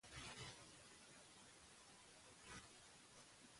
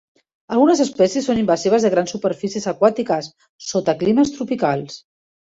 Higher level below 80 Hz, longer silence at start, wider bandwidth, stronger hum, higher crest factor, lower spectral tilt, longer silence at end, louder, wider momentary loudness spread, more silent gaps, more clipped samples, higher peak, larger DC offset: second, -76 dBFS vs -58 dBFS; second, 0.05 s vs 0.5 s; first, 11.5 kHz vs 8 kHz; neither; about the same, 20 dB vs 16 dB; second, -2 dB/octave vs -5 dB/octave; second, 0 s vs 0.5 s; second, -60 LUFS vs -19 LUFS; about the same, 9 LU vs 9 LU; second, none vs 3.49-3.59 s; neither; second, -42 dBFS vs -2 dBFS; neither